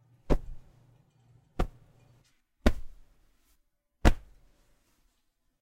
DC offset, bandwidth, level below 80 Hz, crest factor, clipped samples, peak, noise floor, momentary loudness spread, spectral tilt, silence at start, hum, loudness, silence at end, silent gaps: under 0.1%; 14 kHz; -36 dBFS; 26 dB; under 0.1%; -6 dBFS; -75 dBFS; 19 LU; -6.5 dB/octave; 0.3 s; none; -32 LUFS; 1.45 s; none